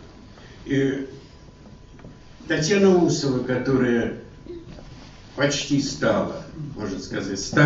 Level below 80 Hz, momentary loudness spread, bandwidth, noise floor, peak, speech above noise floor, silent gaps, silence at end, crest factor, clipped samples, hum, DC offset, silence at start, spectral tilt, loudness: -48 dBFS; 23 LU; 8 kHz; -45 dBFS; -4 dBFS; 24 dB; none; 0 s; 20 dB; under 0.1%; none; under 0.1%; 0 s; -5 dB/octave; -23 LUFS